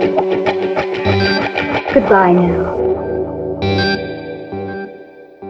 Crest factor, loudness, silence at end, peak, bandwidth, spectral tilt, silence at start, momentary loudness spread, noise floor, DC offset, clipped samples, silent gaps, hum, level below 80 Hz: 16 dB; -15 LUFS; 0 s; 0 dBFS; 7.2 kHz; -7.5 dB/octave; 0 s; 15 LU; -37 dBFS; under 0.1%; under 0.1%; none; none; -40 dBFS